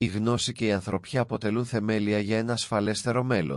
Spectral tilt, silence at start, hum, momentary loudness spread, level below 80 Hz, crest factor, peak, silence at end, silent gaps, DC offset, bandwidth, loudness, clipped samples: -5.5 dB/octave; 0 s; none; 3 LU; -60 dBFS; 14 dB; -12 dBFS; 0 s; none; under 0.1%; 12 kHz; -27 LUFS; under 0.1%